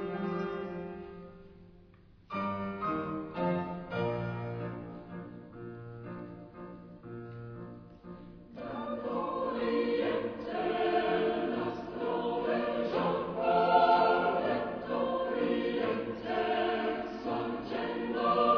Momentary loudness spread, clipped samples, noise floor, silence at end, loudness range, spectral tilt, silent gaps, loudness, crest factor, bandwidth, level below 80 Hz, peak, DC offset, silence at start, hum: 18 LU; under 0.1%; -58 dBFS; 0 s; 15 LU; -4.5 dB/octave; none; -32 LUFS; 20 dB; 5.4 kHz; -62 dBFS; -14 dBFS; under 0.1%; 0 s; none